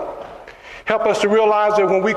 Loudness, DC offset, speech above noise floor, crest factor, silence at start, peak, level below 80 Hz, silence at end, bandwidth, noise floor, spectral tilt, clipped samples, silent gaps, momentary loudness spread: -16 LUFS; under 0.1%; 23 dB; 16 dB; 0 s; 0 dBFS; -54 dBFS; 0 s; 11 kHz; -38 dBFS; -5 dB/octave; under 0.1%; none; 21 LU